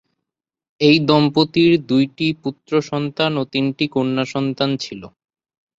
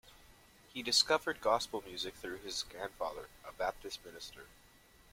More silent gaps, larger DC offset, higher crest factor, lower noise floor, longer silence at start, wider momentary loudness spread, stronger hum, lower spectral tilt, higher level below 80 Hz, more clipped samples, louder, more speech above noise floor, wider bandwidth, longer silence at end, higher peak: neither; neither; second, 18 dB vs 24 dB; first, -85 dBFS vs -63 dBFS; first, 0.8 s vs 0.05 s; second, 9 LU vs 19 LU; neither; first, -6.5 dB/octave vs -1 dB/octave; first, -58 dBFS vs -64 dBFS; neither; first, -18 LUFS vs -36 LUFS; first, 67 dB vs 25 dB; second, 7.8 kHz vs 16.5 kHz; about the same, 0.7 s vs 0.6 s; first, -2 dBFS vs -14 dBFS